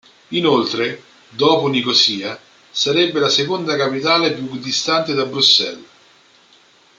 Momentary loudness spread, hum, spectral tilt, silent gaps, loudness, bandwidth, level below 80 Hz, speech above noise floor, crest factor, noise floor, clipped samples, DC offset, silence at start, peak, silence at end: 13 LU; none; -3.5 dB/octave; none; -16 LUFS; 9.2 kHz; -66 dBFS; 34 dB; 18 dB; -51 dBFS; under 0.1%; under 0.1%; 0.3 s; -2 dBFS; 1.15 s